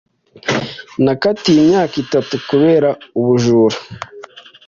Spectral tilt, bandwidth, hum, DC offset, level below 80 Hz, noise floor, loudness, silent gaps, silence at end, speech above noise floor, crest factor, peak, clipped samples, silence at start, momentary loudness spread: -6 dB/octave; 7.4 kHz; none; under 0.1%; -52 dBFS; -38 dBFS; -14 LUFS; none; 0.25 s; 24 dB; 14 dB; -2 dBFS; under 0.1%; 0.45 s; 14 LU